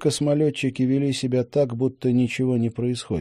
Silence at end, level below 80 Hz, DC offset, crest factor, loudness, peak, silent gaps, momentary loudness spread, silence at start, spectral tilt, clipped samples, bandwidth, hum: 0 s; -58 dBFS; under 0.1%; 14 dB; -23 LUFS; -8 dBFS; none; 3 LU; 0 s; -6.5 dB/octave; under 0.1%; 12.5 kHz; none